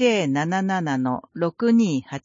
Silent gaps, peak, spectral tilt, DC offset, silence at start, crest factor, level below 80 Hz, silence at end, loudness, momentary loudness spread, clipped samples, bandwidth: none; -6 dBFS; -6 dB/octave; under 0.1%; 0 s; 14 dB; -66 dBFS; 0.05 s; -22 LUFS; 7 LU; under 0.1%; 7.6 kHz